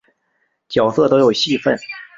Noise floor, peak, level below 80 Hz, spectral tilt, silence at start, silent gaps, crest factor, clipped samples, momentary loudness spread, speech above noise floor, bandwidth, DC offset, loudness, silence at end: -67 dBFS; -2 dBFS; -54 dBFS; -5 dB/octave; 0.7 s; none; 16 dB; under 0.1%; 8 LU; 52 dB; 7.8 kHz; under 0.1%; -16 LUFS; 0.15 s